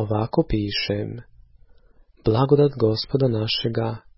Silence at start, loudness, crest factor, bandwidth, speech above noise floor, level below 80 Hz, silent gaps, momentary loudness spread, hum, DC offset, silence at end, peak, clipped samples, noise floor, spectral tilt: 0 s; -22 LUFS; 18 dB; 5.8 kHz; 32 dB; -42 dBFS; none; 10 LU; none; under 0.1%; 0.2 s; -4 dBFS; under 0.1%; -53 dBFS; -10 dB/octave